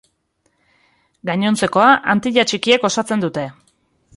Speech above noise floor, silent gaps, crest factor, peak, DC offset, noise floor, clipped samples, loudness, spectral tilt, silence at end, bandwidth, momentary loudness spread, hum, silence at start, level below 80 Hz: 50 dB; none; 18 dB; -2 dBFS; under 0.1%; -66 dBFS; under 0.1%; -16 LUFS; -4 dB/octave; 0.65 s; 11.5 kHz; 13 LU; none; 1.25 s; -58 dBFS